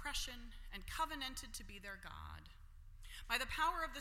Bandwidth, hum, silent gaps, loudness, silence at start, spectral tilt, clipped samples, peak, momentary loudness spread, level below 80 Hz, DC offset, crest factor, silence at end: 16.5 kHz; none; none; -43 LUFS; 0 s; -2 dB/octave; under 0.1%; -22 dBFS; 21 LU; -54 dBFS; under 0.1%; 24 dB; 0 s